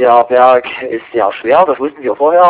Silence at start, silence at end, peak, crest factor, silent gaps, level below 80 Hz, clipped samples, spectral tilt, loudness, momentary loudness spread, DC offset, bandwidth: 0 s; 0 s; 0 dBFS; 10 dB; none; -56 dBFS; 1%; -8 dB/octave; -11 LUFS; 10 LU; under 0.1%; 4 kHz